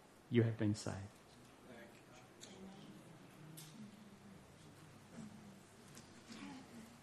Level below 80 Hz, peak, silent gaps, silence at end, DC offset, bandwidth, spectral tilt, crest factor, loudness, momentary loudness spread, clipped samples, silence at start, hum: -78 dBFS; -20 dBFS; none; 0 s; under 0.1%; 13 kHz; -6.5 dB/octave; 26 dB; -44 LUFS; 22 LU; under 0.1%; 0 s; none